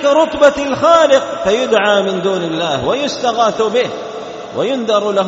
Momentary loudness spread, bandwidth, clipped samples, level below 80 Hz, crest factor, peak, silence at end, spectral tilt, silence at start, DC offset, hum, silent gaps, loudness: 10 LU; 8 kHz; under 0.1%; -48 dBFS; 14 dB; 0 dBFS; 0 s; -2.5 dB/octave; 0 s; under 0.1%; none; none; -13 LUFS